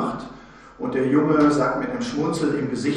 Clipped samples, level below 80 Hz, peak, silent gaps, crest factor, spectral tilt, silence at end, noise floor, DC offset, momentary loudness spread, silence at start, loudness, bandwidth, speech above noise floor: under 0.1%; -52 dBFS; -6 dBFS; none; 16 dB; -6.5 dB/octave; 0 s; -44 dBFS; under 0.1%; 13 LU; 0 s; -22 LUFS; 10 kHz; 23 dB